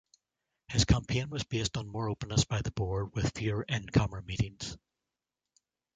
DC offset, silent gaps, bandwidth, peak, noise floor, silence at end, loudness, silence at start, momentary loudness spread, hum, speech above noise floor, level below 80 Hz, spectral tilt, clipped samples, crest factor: under 0.1%; none; 9.4 kHz; -10 dBFS; -89 dBFS; 1.2 s; -32 LUFS; 0.7 s; 8 LU; none; 58 dB; -44 dBFS; -5 dB/octave; under 0.1%; 22 dB